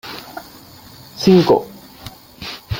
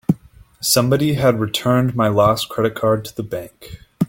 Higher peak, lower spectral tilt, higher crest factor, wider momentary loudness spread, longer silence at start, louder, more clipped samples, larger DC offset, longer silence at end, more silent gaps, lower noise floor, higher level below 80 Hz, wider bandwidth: about the same, -2 dBFS vs -2 dBFS; first, -6.5 dB/octave vs -5 dB/octave; about the same, 18 dB vs 16 dB; first, 24 LU vs 12 LU; about the same, 0.05 s vs 0.1 s; first, -14 LUFS vs -18 LUFS; neither; neither; about the same, 0 s vs 0.05 s; neither; second, -41 dBFS vs -45 dBFS; about the same, -44 dBFS vs -48 dBFS; about the same, 17 kHz vs 17 kHz